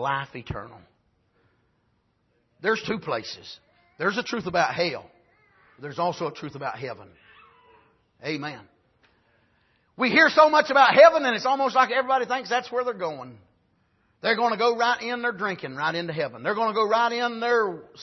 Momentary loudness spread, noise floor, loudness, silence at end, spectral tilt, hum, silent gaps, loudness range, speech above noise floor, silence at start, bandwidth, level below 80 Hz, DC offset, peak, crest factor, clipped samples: 20 LU; -69 dBFS; -23 LUFS; 0 s; -4.5 dB/octave; none; none; 15 LU; 46 dB; 0 s; 6.2 kHz; -62 dBFS; under 0.1%; -4 dBFS; 22 dB; under 0.1%